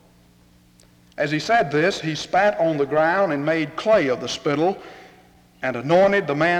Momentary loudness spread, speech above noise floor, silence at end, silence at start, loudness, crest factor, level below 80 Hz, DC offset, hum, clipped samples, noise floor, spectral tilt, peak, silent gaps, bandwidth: 9 LU; 34 dB; 0 s; 1.2 s; -20 LUFS; 14 dB; -58 dBFS; under 0.1%; none; under 0.1%; -54 dBFS; -5.5 dB/octave; -6 dBFS; none; 12 kHz